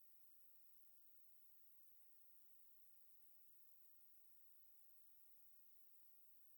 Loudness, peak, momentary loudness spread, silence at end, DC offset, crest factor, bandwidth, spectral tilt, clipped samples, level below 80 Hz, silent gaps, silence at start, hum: -64 LUFS; -54 dBFS; 0 LU; 0 s; under 0.1%; 14 dB; over 20 kHz; -1 dB/octave; under 0.1%; under -90 dBFS; none; 0 s; none